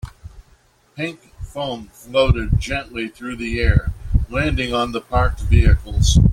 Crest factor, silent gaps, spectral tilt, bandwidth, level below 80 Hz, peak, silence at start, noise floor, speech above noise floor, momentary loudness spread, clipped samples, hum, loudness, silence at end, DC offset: 16 dB; none; -5.5 dB/octave; 13 kHz; -22 dBFS; -2 dBFS; 0.05 s; -55 dBFS; 37 dB; 12 LU; under 0.1%; none; -20 LUFS; 0 s; under 0.1%